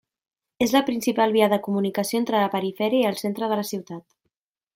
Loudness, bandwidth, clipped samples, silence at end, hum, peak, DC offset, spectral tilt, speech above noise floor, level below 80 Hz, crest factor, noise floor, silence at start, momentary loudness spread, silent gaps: -23 LUFS; 16.5 kHz; under 0.1%; 0.75 s; none; -4 dBFS; under 0.1%; -5 dB/octave; 56 dB; -68 dBFS; 20 dB; -78 dBFS; 0.6 s; 8 LU; none